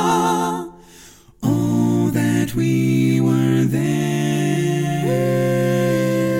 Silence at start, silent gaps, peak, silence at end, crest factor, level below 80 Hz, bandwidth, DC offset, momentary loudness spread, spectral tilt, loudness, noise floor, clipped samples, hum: 0 s; none; -6 dBFS; 0 s; 12 dB; -50 dBFS; 17 kHz; under 0.1%; 4 LU; -6.5 dB/octave; -18 LUFS; -45 dBFS; under 0.1%; none